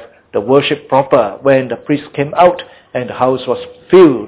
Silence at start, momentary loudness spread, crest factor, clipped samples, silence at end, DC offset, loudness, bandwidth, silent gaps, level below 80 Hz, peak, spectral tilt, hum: 0 s; 11 LU; 12 dB; under 0.1%; 0 s; under 0.1%; -13 LUFS; 4 kHz; none; -50 dBFS; 0 dBFS; -10.5 dB/octave; none